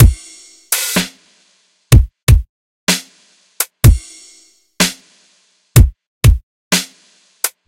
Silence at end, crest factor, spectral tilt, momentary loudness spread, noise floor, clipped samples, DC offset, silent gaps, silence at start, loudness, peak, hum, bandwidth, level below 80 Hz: 0.2 s; 14 dB; -4 dB/octave; 13 LU; -57 dBFS; 0.7%; under 0.1%; 2.23-2.27 s, 2.49-2.87 s, 6.07-6.21 s, 6.43-6.71 s; 0 s; -15 LUFS; 0 dBFS; none; 17.5 kHz; -18 dBFS